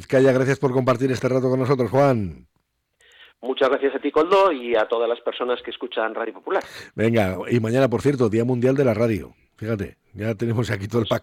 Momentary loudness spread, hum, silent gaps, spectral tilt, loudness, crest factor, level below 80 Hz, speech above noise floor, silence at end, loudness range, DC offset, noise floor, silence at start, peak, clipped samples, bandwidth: 11 LU; none; none; -7 dB/octave; -21 LUFS; 12 dB; -56 dBFS; 45 dB; 0 s; 2 LU; under 0.1%; -66 dBFS; 0 s; -8 dBFS; under 0.1%; 15.5 kHz